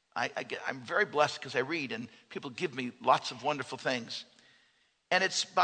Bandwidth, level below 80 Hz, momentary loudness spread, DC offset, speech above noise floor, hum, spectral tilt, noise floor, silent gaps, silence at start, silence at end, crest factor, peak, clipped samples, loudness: 9.4 kHz; -82 dBFS; 13 LU; under 0.1%; 38 dB; none; -3 dB/octave; -71 dBFS; none; 0.15 s; 0 s; 22 dB; -10 dBFS; under 0.1%; -32 LUFS